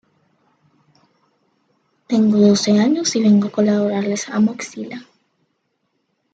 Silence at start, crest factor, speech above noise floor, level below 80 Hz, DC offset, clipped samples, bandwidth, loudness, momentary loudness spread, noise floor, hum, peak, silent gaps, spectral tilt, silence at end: 2.1 s; 16 dB; 54 dB; -66 dBFS; under 0.1%; under 0.1%; 8.8 kHz; -16 LUFS; 16 LU; -70 dBFS; none; -4 dBFS; none; -5.5 dB/octave; 1.3 s